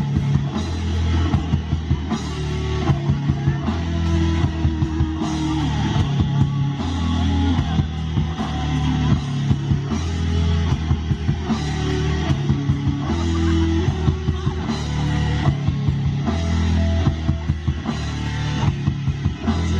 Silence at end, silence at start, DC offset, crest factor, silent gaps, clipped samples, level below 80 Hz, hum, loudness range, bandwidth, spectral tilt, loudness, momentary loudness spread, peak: 0 s; 0 s; under 0.1%; 16 dB; none; under 0.1%; -30 dBFS; none; 1 LU; 8.2 kHz; -7 dB/octave; -21 LUFS; 4 LU; -4 dBFS